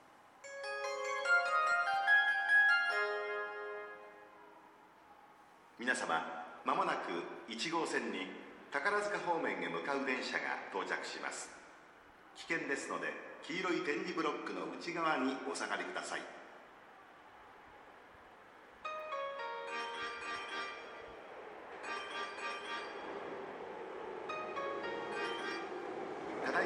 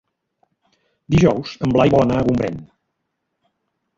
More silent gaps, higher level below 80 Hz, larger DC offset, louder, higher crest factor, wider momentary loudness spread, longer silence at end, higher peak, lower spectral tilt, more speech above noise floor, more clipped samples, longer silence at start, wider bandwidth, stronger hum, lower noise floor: neither; second, -80 dBFS vs -42 dBFS; neither; second, -37 LUFS vs -17 LUFS; about the same, 20 dB vs 18 dB; first, 24 LU vs 9 LU; second, 0 s vs 1.35 s; second, -18 dBFS vs -2 dBFS; second, -2.5 dB/octave vs -7.5 dB/octave; second, 23 dB vs 59 dB; neither; second, 0 s vs 1.1 s; first, 12 kHz vs 7.6 kHz; neither; second, -61 dBFS vs -75 dBFS